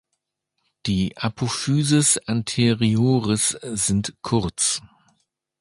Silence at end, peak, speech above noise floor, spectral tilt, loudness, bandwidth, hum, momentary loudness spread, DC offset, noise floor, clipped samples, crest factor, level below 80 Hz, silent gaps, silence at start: 0.75 s; -6 dBFS; 57 dB; -4 dB/octave; -21 LUFS; 11.5 kHz; none; 8 LU; under 0.1%; -78 dBFS; under 0.1%; 18 dB; -48 dBFS; none; 0.85 s